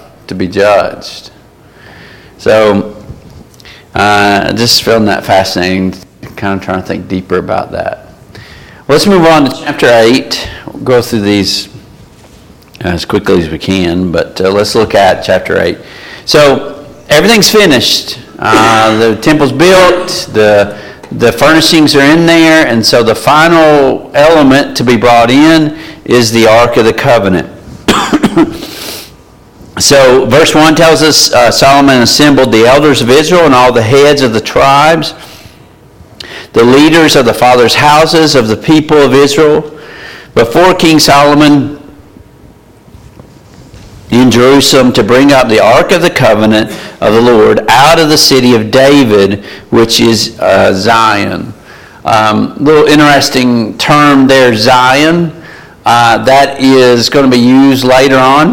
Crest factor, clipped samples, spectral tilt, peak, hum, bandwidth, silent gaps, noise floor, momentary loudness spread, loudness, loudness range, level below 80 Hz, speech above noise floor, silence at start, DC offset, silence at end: 6 dB; 0.6%; -4.5 dB/octave; 0 dBFS; none; 17.5 kHz; none; -37 dBFS; 12 LU; -6 LUFS; 7 LU; -36 dBFS; 31 dB; 0.3 s; under 0.1%; 0 s